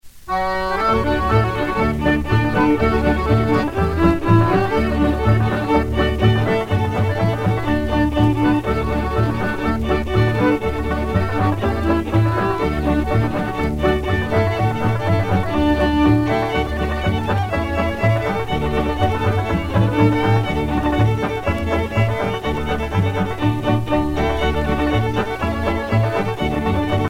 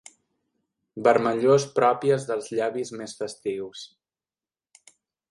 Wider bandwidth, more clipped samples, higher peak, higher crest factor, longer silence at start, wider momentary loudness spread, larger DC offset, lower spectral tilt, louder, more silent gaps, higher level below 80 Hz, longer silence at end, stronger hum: first, 15.5 kHz vs 11.5 kHz; neither; first, -2 dBFS vs -6 dBFS; second, 16 dB vs 22 dB; second, 0.05 s vs 0.95 s; second, 5 LU vs 17 LU; neither; first, -7.5 dB/octave vs -5.5 dB/octave; first, -19 LUFS vs -24 LUFS; neither; first, -28 dBFS vs -72 dBFS; second, 0 s vs 1.45 s; neither